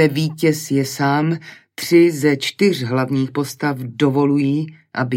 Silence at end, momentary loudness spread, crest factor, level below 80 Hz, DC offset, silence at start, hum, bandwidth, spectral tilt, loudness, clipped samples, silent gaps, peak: 0 s; 10 LU; 16 dB; -64 dBFS; under 0.1%; 0 s; none; 16.5 kHz; -6 dB/octave; -18 LUFS; under 0.1%; none; -2 dBFS